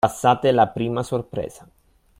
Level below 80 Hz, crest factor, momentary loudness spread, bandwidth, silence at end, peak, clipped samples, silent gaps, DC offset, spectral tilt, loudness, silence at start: -52 dBFS; 18 dB; 13 LU; 16 kHz; 0.7 s; -2 dBFS; under 0.1%; none; under 0.1%; -6 dB/octave; -21 LUFS; 0.05 s